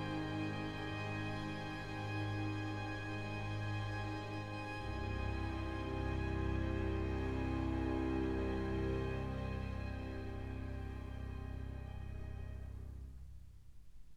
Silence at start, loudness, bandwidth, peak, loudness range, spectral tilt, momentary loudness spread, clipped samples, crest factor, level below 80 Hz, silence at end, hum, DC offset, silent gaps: 0 s; -42 LUFS; 11.5 kHz; -26 dBFS; 8 LU; -7.5 dB/octave; 10 LU; under 0.1%; 16 dB; -48 dBFS; 0 s; 50 Hz at -65 dBFS; under 0.1%; none